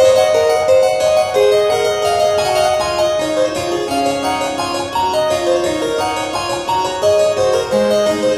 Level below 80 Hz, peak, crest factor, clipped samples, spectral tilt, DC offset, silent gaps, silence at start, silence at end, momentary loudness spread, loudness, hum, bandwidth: -46 dBFS; 0 dBFS; 14 dB; under 0.1%; -3.5 dB/octave; 0.2%; none; 0 s; 0 s; 6 LU; -15 LUFS; none; 13 kHz